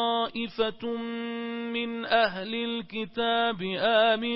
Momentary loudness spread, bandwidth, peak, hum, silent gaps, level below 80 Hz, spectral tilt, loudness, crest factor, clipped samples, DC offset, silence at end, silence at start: 11 LU; 5.8 kHz; -10 dBFS; none; none; -64 dBFS; -8.5 dB/octave; -28 LUFS; 18 dB; under 0.1%; under 0.1%; 0 s; 0 s